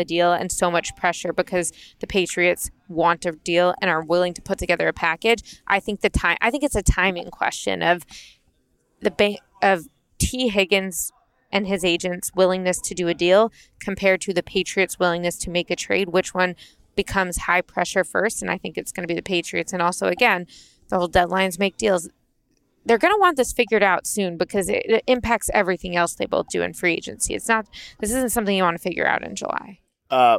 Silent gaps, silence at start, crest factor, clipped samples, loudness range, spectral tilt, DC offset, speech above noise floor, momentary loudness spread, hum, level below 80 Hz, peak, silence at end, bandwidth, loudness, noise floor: none; 0 s; 18 dB; under 0.1%; 3 LU; -3.5 dB/octave; under 0.1%; 45 dB; 8 LU; none; -40 dBFS; -4 dBFS; 0 s; 16.5 kHz; -21 LUFS; -66 dBFS